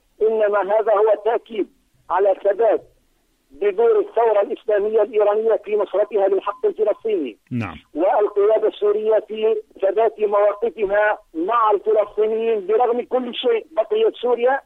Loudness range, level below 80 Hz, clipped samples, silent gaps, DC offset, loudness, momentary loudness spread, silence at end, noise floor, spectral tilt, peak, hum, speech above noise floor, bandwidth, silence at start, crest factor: 2 LU; -60 dBFS; under 0.1%; none; under 0.1%; -19 LUFS; 6 LU; 0.05 s; -63 dBFS; -7 dB/octave; -6 dBFS; none; 44 dB; 4 kHz; 0.2 s; 12 dB